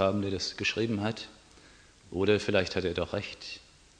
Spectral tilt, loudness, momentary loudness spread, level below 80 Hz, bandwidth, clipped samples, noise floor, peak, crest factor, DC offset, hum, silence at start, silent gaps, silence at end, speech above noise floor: -5 dB/octave; -30 LUFS; 15 LU; -58 dBFS; 10 kHz; under 0.1%; -56 dBFS; -10 dBFS; 22 dB; under 0.1%; none; 0 s; none; 0.4 s; 26 dB